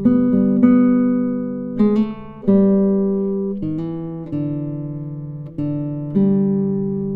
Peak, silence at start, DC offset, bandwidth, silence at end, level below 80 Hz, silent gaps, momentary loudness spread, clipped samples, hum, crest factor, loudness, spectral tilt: -2 dBFS; 0 s; under 0.1%; 3.8 kHz; 0 s; -48 dBFS; none; 13 LU; under 0.1%; none; 16 dB; -18 LUFS; -12 dB/octave